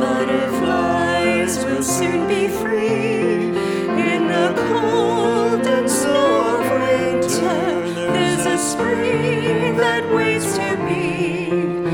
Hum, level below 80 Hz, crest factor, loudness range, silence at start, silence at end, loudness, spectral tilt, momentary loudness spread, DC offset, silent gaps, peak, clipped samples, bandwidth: none; -54 dBFS; 14 dB; 1 LU; 0 s; 0 s; -18 LUFS; -4.5 dB/octave; 3 LU; under 0.1%; none; -4 dBFS; under 0.1%; 19 kHz